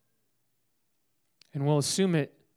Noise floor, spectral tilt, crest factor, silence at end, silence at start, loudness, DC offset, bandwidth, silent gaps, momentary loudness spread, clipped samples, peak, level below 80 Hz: -78 dBFS; -5 dB/octave; 18 dB; 0.3 s; 1.55 s; -28 LUFS; under 0.1%; 15.5 kHz; none; 8 LU; under 0.1%; -14 dBFS; -78 dBFS